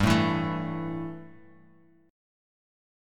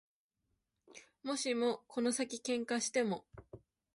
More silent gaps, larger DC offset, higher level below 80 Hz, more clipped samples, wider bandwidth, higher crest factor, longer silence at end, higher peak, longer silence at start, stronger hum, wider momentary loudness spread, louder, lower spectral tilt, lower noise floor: neither; neither; first, -48 dBFS vs -74 dBFS; neither; first, 17 kHz vs 11.5 kHz; about the same, 24 dB vs 20 dB; first, 1 s vs 0.4 s; first, -8 dBFS vs -20 dBFS; second, 0 s vs 0.95 s; neither; about the same, 20 LU vs 22 LU; first, -29 LUFS vs -37 LUFS; first, -6 dB/octave vs -3 dB/octave; second, -59 dBFS vs -85 dBFS